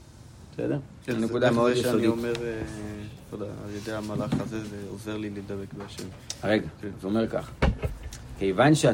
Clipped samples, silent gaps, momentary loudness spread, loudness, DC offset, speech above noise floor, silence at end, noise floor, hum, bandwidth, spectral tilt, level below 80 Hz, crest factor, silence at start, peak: under 0.1%; none; 16 LU; -28 LUFS; under 0.1%; 20 dB; 0 s; -48 dBFS; none; 16 kHz; -6 dB/octave; -42 dBFS; 20 dB; 0 s; -8 dBFS